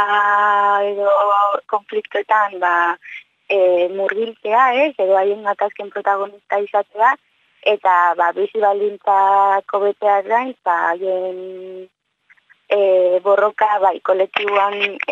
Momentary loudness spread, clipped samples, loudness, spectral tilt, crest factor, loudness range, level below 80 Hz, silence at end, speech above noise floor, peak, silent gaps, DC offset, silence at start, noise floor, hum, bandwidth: 9 LU; under 0.1%; -17 LUFS; -4.5 dB/octave; 16 dB; 3 LU; -76 dBFS; 0 s; 40 dB; 0 dBFS; none; under 0.1%; 0 s; -56 dBFS; none; 7.4 kHz